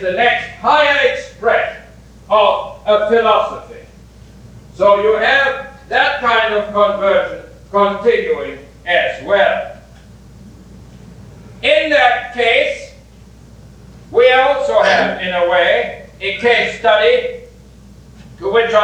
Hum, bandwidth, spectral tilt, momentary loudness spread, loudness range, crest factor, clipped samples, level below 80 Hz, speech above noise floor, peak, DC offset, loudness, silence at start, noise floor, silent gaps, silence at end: none; 9.4 kHz; -4 dB/octave; 12 LU; 3 LU; 16 dB; under 0.1%; -44 dBFS; 27 dB; 0 dBFS; under 0.1%; -14 LUFS; 0 s; -40 dBFS; none; 0 s